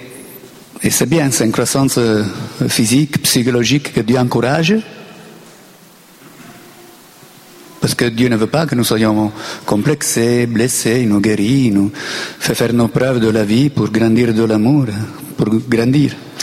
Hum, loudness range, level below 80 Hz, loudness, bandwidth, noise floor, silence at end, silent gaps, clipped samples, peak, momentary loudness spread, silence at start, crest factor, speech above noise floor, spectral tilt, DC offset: none; 6 LU; -46 dBFS; -14 LUFS; 16.5 kHz; -43 dBFS; 0 s; none; under 0.1%; -2 dBFS; 8 LU; 0 s; 14 dB; 29 dB; -5 dB/octave; under 0.1%